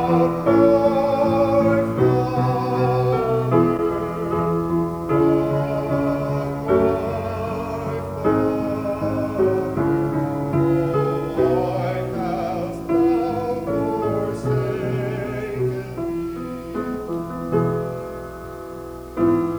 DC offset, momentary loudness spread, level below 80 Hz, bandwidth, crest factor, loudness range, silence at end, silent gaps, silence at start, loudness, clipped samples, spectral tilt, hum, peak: under 0.1%; 10 LU; -44 dBFS; over 20 kHz; 18 dB; 7 LU; 0 s; none; 0 s; -21 LUFS; under 0.1%; -8.5 dB/octave; none; -4 dBFS